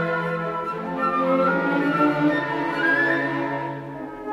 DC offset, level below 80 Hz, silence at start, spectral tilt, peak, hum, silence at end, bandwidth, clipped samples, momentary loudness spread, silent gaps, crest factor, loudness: under 0.1%; -60 dBFS; 0 s; -7 dB/octave; -8 dBFS; none; 0 s; 12 kHz; under 0.1%; 10 LU; none; 16 dB; -22 LUFS